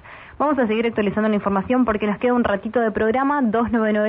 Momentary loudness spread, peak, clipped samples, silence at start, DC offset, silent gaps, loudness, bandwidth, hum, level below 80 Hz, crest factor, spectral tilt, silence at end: 2 LU; -6 dBFS; under 0.1%; 0.05 s; under 0.1%; none; -20 LUFS; 4 kHz; none; -48 dBFS; 12 dB; -11 dB/octave; 0 s